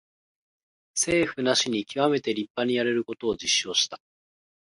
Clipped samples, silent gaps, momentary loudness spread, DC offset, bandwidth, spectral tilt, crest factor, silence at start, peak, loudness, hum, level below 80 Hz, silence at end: under 0.1%; 2.50-2.55 s; 7 LU; under 0.1%; 11.5 kHz; -2.5 dB/octave; 20 dB; 0.95 s; -8 dBFS; -25 LUFS; none; -62 dBFS; 0.8 s